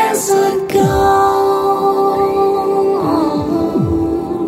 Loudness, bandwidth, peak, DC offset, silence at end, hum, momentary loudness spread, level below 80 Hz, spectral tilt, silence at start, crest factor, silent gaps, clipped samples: -14 LUFS; 16 kHz; -2 dBFS; under 0.1%; 0 s; none; 4 LU; -36 dBFS; -5.5 dB/octave; 0 s; 12 dB; none; under 0.1%